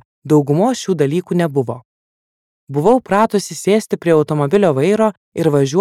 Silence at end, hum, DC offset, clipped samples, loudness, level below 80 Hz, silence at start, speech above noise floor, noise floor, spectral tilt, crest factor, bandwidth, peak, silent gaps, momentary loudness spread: 0 s; none; under 0.1%; under 0.1%; -16 LUFS; -56 dBFS; 0.25 s; over 75 dB; under -90 dBFS; -6.5 dB/octave; 14 dB; 15 kHz; -2 dBFS; 1.85-2.67 s, 5.17-5.32 s; 5 LU